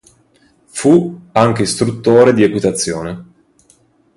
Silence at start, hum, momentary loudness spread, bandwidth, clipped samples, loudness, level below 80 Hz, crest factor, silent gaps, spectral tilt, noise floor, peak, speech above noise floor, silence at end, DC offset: 0.75 s; none; 15 LU; 11.5 kHz; under 0.1%; -13 LUFS; -48 dBFS; 14 dB; none; -5.5 dB/octave; -53 dBFS; 0 dBFS; 41 dB; 0.95 s; under 0.1%